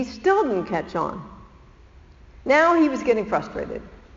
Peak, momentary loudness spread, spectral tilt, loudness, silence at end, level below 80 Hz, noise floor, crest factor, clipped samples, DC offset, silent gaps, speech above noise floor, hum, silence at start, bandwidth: -4 dBFS; 17 LU; -4 dB/octave; -21 LUFS; 0.2 s; -50 dBFS; -49 dBFS; 18 dB; under 0.1%; under 0.1%; none; 27 dB; none; 0 s; 7.6 kHz